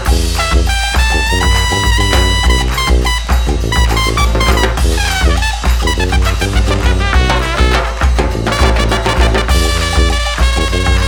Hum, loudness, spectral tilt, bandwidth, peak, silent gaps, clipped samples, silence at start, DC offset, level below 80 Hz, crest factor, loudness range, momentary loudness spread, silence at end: none; -13 LUFS; -4 dB/octave; 18 kHz; 0 dBFS; none; under 0.1%; 0 s; under 0.1%; -14 dBFS; 12 dB; 1 LU; 2 LU; 0 s